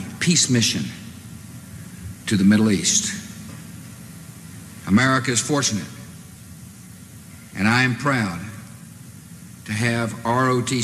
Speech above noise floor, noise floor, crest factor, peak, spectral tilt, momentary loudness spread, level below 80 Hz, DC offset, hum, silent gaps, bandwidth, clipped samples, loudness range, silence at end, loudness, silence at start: 22 dB; -41 dBFS; 18 dB; -6 dBFS; -3.5 dB/octave; 24 LU; -54 dBFS; under 0.1%; none; none; 14.5 kHz; under 0.1%; 4 LU; 0 s; -20 LUFS; 0 s